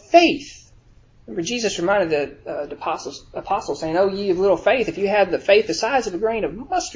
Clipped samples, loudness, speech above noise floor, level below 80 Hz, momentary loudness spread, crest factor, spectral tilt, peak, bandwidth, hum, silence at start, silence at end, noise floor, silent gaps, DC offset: under 0.1%; -20 LUFS; 31 dB; -50 dBFS; 12 LU; 20 dB; -4 dB/octave; 0 dBFS; 7.6 kHz; none; 0.1 s; 0 s; -51 dBFS; none; under 0.1%